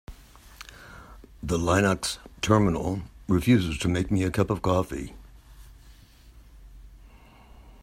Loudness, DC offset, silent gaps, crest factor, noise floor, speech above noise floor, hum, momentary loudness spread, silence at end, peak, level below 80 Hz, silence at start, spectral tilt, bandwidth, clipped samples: -25 LUFS; under 0.1%; none; 22 dB; -51 dBFS; 27 dB; none; 23 LU; 0.1 s; -6 dBFS; -46 dBFS; 0.1 s; -6 dB/octave; 16 kHz; under 0.1%